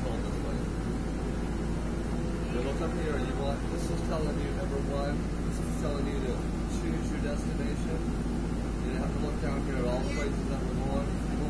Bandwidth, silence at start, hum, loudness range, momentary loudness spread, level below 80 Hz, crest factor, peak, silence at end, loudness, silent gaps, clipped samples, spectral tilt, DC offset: 11 kHz; 0 s; none; 1 LU; 2 LU; -34 dBFS; 14 dB; -18 dBFS; 0 s; -32 LUFS; none; under 0.1%; -6.5 dB/octave; 0.3%